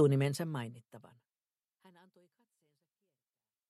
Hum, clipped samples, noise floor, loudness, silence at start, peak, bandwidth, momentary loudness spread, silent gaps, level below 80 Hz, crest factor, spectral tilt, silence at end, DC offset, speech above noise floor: none; under 0.1%; under -90 dBFS; -35 LUFS; 0 s; -16 dBFS; 14 kHz; 27 LU; none; -78 dBFS; 22 dB; -7 dB/octave; 2.7 s; under 0.1%; over 57 dB